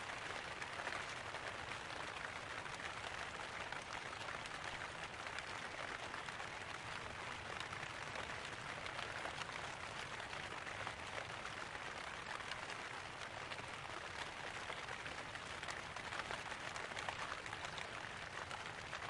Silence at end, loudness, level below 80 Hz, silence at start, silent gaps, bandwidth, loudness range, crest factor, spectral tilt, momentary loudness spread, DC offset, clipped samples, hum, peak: 0 s; -46 LUFS; -68 dBFS; 0 s; none; 11.5 kHz; 1 LU; 22 dB; -2.5 dB/octave; 2 LU; under 0.1%; under 0.1%; none; -26 dBFS